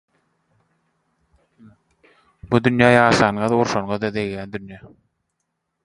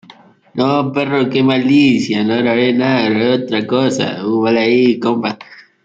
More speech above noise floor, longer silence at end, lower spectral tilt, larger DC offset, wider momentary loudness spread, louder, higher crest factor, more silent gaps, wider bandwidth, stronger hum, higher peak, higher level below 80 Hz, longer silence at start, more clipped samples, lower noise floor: first, 58 dB vs 30 dB; first, 1 s vs 0.25 s; about the same, -6 dB/octave vs -6 dB/octave; neither; first, 18 LU vs 7 LU; second, -18 LUFS vs -14 LUFS; first, 22 dB vs 14 dB; neither; first, 11 kHz vs 7.8 kHz; neither; about the same, 0 dBFS vs 0 dBFS; first, -52 dBFS vs -58 dBFS; first, 2.45 s vs 0.55 s; neither; first, -76 dBFS vs -44 dBFS